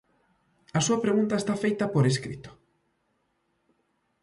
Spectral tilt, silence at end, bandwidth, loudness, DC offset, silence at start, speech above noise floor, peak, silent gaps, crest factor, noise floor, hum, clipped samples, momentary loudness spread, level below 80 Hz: -5.5 dB/octave; 1.7 s; 11.5 kHz; -26 LUFS; under 0.1%; 0.75 s; 48 dB; -12 dBFS; none; 18 dB; -74 dBFS; none; under 0.1%; 8 LU; -62 dBFS